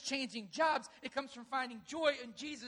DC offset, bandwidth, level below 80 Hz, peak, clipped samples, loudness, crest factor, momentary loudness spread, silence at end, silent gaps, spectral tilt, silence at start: under 0.1%; 11.5 kHz; -78 dBFS; -18 dBFS; under 0.1%; -38 LUFS; 20 dB; 9 LU; 0 s; none; -2 dB/octave; 0 s